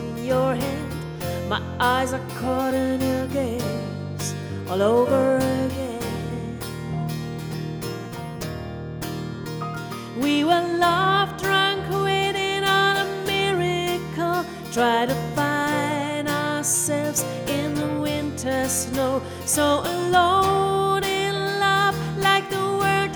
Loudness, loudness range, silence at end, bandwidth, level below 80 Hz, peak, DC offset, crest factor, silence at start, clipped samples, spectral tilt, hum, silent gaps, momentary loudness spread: -23 LUFS; 8 LU; 0 s; over 20 kHz; -48 dBFS; -6 dBFS; under 0.1%; 18 dB; 0 s; under 0.1%; -4 dB/octave; none; none; 11 LU